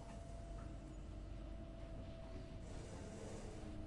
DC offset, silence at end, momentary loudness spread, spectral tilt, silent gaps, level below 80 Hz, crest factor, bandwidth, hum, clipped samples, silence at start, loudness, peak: under 0.1%; 0 s; 2 LU; -6 dB/octave; none; -54 dBFS; 12 dB; 11.5 kHz; none; under 0.1%; 0 s; -53 LUFS; -38 dBFS